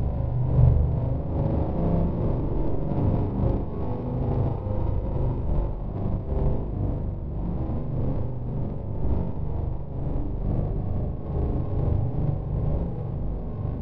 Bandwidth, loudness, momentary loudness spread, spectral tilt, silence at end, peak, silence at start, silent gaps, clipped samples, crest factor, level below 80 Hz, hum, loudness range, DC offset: 3.9 kHz; -28 LUFS; 6 LU; -13 dB/octave; 0 s; -4 dBFS; 0 s; none; under 0.1%; 20 dB; -30 dBFS; none; 5 LU; 1%